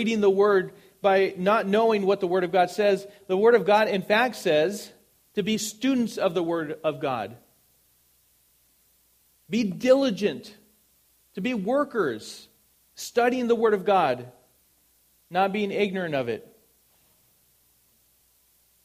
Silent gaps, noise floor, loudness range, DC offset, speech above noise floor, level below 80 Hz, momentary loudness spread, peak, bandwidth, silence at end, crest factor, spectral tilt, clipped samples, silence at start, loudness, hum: none; -64 dBFS; 8 LU; under 0.1%; 40 dB; -70 dBFS; 12 LU; -8 dBFS; 15.5 kHz; 2.45 s; 18 dB; -5 dB/octave; under 0.1%; 0 s; -24 LUFS; none